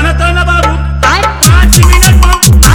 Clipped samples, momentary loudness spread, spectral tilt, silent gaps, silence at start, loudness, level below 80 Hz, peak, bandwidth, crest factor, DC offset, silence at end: 6%; 5 LU; -3.5 dB/octave; none; 0 s; -6 LUFS; -8 dBFS; 0 dBFS; over 20 kHz; 6 dB; under 0.1%; 0 s